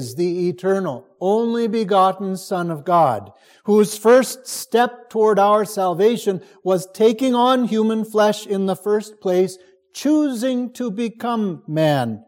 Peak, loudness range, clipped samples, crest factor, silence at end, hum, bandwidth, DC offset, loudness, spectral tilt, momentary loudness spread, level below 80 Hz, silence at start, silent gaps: -2 dBFS; 4 LU; under 0.1%; 16 dB; 0.1 s; none; 17 kHz; under 0.1%; -19 LUFS; -5.5 dB/octave; 9 LU; -72 dBFS; 0 s; none